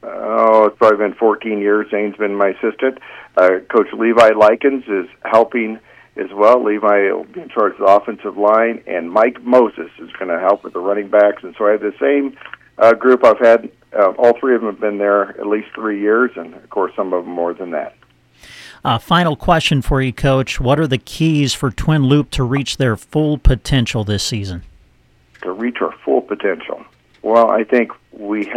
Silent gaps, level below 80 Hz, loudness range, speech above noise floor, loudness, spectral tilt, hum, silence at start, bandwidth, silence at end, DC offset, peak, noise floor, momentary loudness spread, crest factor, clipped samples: none; -32 dBFS; 6 LU; 38 dB; -15 LUFS; -6 dB/octave; none; 0.05 s; 14.5 kHz; 0 s; under 0.1%; 0 dBFS; -53 dBFS; 13 LU; 16 dB; under 0.1%